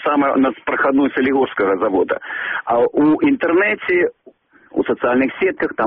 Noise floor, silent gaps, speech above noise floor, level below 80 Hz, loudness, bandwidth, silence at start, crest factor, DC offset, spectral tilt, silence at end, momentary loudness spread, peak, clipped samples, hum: -48 dBFS; none; 32 dB; -56 dBFS; -17 LUFS; 4.1 kHz; 0 s; 12 dB; under 0.1%; -3.5 dB/octave; 0 s; 7 LU; -6 dBFS; under 0.1%; none